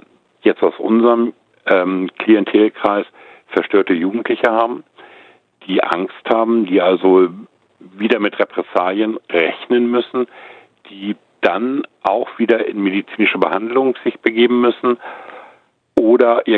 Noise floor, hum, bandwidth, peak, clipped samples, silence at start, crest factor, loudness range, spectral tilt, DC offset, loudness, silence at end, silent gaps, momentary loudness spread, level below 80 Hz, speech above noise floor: -50 dBFS; none; 4.8 kHz; 0 dBFS; under 0.1%; 0.45 s; 16 dB; 3 LU; -7.5 dB/octave; under 0.1%; -16 LUFS; 0 s; none; 10 LU; -64 dBFS; 35 dB